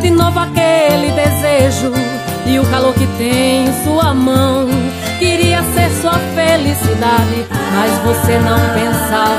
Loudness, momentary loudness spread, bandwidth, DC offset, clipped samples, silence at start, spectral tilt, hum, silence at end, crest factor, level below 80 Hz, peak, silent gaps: -13 LUFS; 4 LU; 15.5 kHz; under 0.1%; under 0.1%; 0 s; -5 dB/octave; none; 0 s; 12 dB; -34 dBFS; 0 dBFS; none